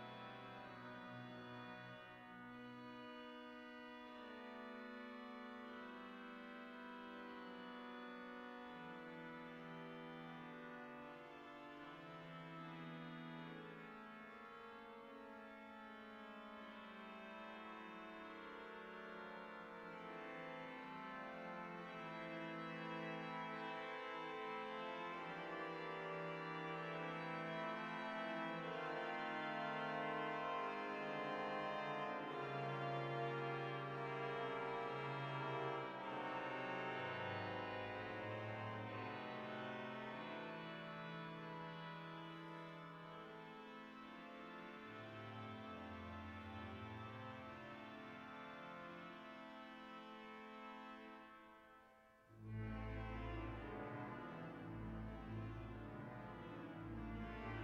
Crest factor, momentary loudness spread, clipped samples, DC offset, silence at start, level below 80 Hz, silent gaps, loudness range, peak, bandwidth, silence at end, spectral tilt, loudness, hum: 18 dB; 11 LU; under 0.1%; under 0.1%; 0 s; -68 dBFS; none; 10 LU; -32 dBFS; 10 kHz; 0 s; -6.5 dB/octave; -50 LUFS; none